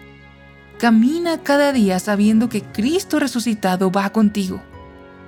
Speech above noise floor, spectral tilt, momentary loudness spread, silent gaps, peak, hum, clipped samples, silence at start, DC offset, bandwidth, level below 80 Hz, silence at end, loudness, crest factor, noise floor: 27 dB; -5.5 dB/octave; 7 LU; none; -4 dBFS; none; under 0.1%; 0 s; under 0.1%; 17 kHz; -50 dBFS; 0 s; -18 LUFS; 14 dB; -44 dBFS